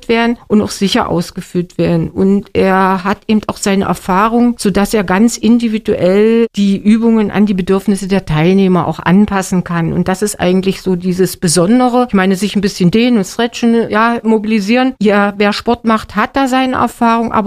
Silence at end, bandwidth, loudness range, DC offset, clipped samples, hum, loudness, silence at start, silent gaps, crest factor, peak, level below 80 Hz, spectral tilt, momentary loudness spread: 0 s; 15.5 kHz; 2 LU; under 0.1%; under 0.1%; none; -12 LUFS; 0.1 s; none; 12 dB; 0 dBFS; -38 dBFS; -5.5 dB/octave; 5 LU